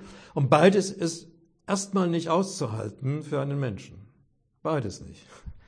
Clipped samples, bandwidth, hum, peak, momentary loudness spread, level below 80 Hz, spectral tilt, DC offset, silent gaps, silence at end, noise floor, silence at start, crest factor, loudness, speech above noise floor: under 0.1%; 10.5 kHz; none; -4 dBFS; 22 LU; -56 dBFS; -6 dB/octave; under 0.1%; none; 0.1 s; -66 dBFS; 0 s; 22 dB; -26 LUFS; 40 dB